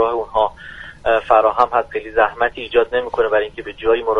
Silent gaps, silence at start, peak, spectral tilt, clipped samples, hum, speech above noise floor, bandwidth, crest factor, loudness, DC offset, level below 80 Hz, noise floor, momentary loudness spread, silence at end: none; 0 s; 0 dBFS; -5.5 dB/octave; under 0.1%; none; 19 dB; 6.6 kHz; 16 dB; -18 LUFS; under 0.1%; -44 dBFS; -36 dBFS; 9 LU; 0 s